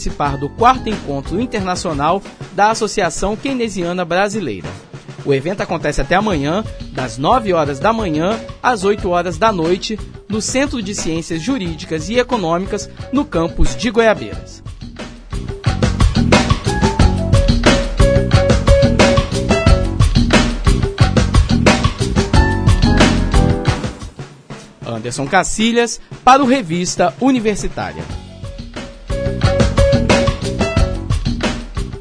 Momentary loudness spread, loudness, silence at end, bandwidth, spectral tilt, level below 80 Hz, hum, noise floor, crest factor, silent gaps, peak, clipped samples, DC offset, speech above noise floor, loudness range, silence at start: 15 LU; -16 LUFS; 0 s; 10.5 kHz; -5.5 dB/octave; -22 dBFS; none; -35 dBFS; 16 dB; none; 0 dBFS; under 0.1%; under 0.1%; 19 dB; 5 LU; 0 s